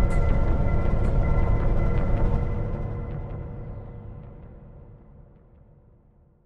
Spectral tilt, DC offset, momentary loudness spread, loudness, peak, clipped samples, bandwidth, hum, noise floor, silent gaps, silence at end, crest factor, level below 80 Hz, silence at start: -9.5 dB/octave; under 0.1%; 20 LU; -27 LUFS; -8 dBFS; under 0.1%; 3.7 kHz; none; -57 dBFS; none; 1.5 s; 16 dB; -26 dBFS; 0 s